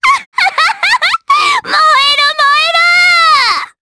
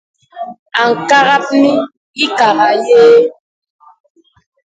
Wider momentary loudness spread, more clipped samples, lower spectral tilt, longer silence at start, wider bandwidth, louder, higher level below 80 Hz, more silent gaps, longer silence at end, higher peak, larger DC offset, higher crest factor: second, 5 LU vs 17 LU; first, 0.1% vs under 0.1%; second, 1.5 dB/octave vs -4 dB/octave; second, 0 s vs 0.35 s; first, 11 kHz vs 9 kHz; about the same, -8 LUFS vs -10 LUFS; first, -52 dBFS vs -62 dBFS; second, 0.26-0.32 s vs 0.59-0.66 s, 1.97-2.14 s; second, 0.15 s vs 1.4 s; about the same, 0 dBFS vs 0 dBFS; neither; about the same, 10 dB vs 12 dB